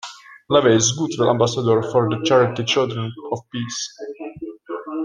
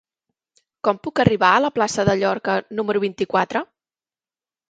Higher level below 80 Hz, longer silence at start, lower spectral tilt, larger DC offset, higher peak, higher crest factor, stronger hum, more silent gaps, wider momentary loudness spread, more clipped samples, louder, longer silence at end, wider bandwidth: second, -58 dBFS vs -50 dBFS; second, 0.05 s vs 0.85 s; about the same, -4.5 dB/octave vs -5 dB/octave; neither; about the same, -2 dBFS vs 0 dBFS; about the same, 18 dB vs 20 dB; neither; neither; first, 17 LU vs 8 LU; neither; about the same, -19 LUFS vs -20 LUFS; second, 0 s vs 1.05 s; about the same, 10 kHz vs 9.2 kHz